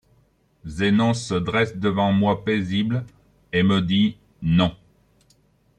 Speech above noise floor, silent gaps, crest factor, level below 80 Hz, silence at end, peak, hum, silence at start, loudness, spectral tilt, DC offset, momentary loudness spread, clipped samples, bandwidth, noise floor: 41 dB; none; 18 dB; -50 dBFS; 1.05 s; -6 dBFS; 50 Hz at -40 dBFS; 0.65 s; -22 LUFS; -6.5 dB/octave; under 0.1%; 9 LU; under 0.1%; 9.8 kHz; -61 dBFS